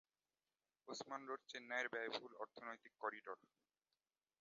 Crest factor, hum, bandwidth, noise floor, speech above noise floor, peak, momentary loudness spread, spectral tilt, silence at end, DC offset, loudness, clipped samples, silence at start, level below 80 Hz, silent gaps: 22 dB; none; 7.2 kHz; under -90 dBFS; over 40 dB; -30 dBFS; 11 LU; 0 dB/octave; 1.05 s; under 0.1%; -49 LUFS; under 0.1%; 0.85 s; under -90 dBFS; none